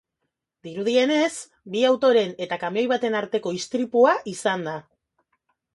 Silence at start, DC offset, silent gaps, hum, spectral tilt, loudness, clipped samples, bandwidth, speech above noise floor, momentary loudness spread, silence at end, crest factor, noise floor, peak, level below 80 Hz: 0.65 s; under 0.1%; none; none; -4 dB/octave; -22 LUFS; under 0.1%; 11.5 kHz; 58 dB; 11 LU; 0.95 s; 20 dB; -80 dBFS; -4 dBFS; -72 dBFS